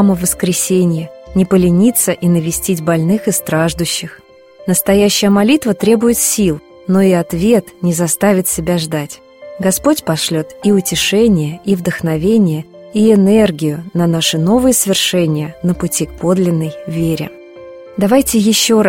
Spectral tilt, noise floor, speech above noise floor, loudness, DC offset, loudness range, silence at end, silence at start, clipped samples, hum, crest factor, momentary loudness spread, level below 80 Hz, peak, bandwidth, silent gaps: -4.5 dB/octave; -34 dBFS; 21 dB; -13 LUFS; under 0.1%; 2 LU; 0 s; 0 s; under 0.1%; none; 14 dB; 8 LU; -40 dBFS; 0 dBFS; 16.5 kHz; none